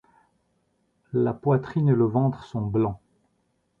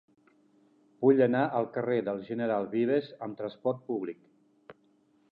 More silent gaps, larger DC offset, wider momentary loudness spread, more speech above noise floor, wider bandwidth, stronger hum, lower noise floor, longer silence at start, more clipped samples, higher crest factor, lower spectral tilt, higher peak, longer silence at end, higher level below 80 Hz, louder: neither; neither; second, 9 LU vs 14 LU; first, 48 dB vs 38 dB; about the same, 4.6 kHz vs 5 kHz; neither; first, -71 dBFS vs -67 dBFS; first, 1.15 s vs 1 s; neither; about the same, 18 dB vs 20 dB; about the same, -11 dB/octave vs -10 dB/octave; about the same, -10 dBFS vs -12 dBFS; first, 0.85 s vs 0.6 s; first, -56 dBFS vs -80 dBFS; first, -24 LUFS vs -30 LUFS